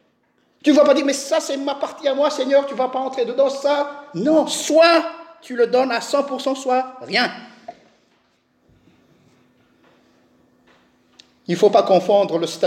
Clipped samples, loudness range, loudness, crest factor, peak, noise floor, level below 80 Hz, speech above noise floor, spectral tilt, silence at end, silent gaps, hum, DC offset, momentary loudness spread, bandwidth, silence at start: under 0.1%; 8 LU; -18 LUFS; 16 dB; -4 dBFS; -63 dBFS; -76 dBFS; 45 dB; -4 dB/octave; 0 s; none; none; under 0.1%; 11 LU; 15 kHz; 0.65 s